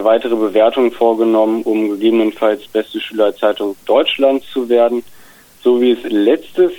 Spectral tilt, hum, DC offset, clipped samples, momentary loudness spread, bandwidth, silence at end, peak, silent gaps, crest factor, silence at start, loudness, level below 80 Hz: -5.5 dB/octave; none; under 0.1%; under 0.1%; 6 LU; 18 kHz; 0 s; -2 dBFS; none; 12 dB; 0 s; -15 LUFS; -60 dBFS